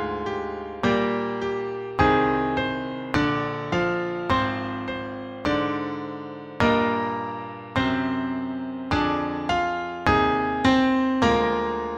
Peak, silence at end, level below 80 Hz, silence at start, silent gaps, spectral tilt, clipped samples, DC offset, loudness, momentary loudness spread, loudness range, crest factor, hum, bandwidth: -2 dBFS; 0 s; -44 dBFS; 0 s; none; -6.5 dB/octave; under 0.1%; under 0.1%; -24 LUFS; 10 LU; 4 LU; 22 dB; none; 8.6 kHz